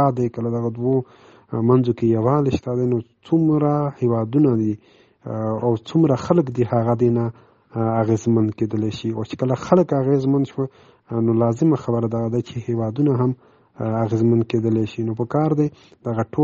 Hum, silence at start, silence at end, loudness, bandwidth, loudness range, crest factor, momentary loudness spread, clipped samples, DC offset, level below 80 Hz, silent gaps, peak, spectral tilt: none; 0 s; 0 s; -20 LUFS; 7.4 kHz; 2 LU; 20 dB; 9 LU; under 0.1%; under 0.1%; -56 dBFS; none; 0 dBFS; -9 dB/octave